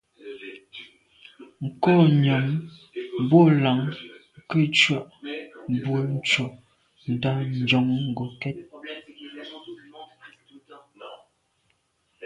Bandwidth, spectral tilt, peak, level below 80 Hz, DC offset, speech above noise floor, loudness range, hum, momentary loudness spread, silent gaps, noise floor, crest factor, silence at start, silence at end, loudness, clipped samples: 9.6 kHz; -6.5 dB/octave; -4 dBFS; -64 dBFS; under 0.1%; 48 dB; 15 LU; none; 25 LU; none; -70 dBFS; 20 dB; 0.25 s; 0 s; -22 LUFS; under 0.1%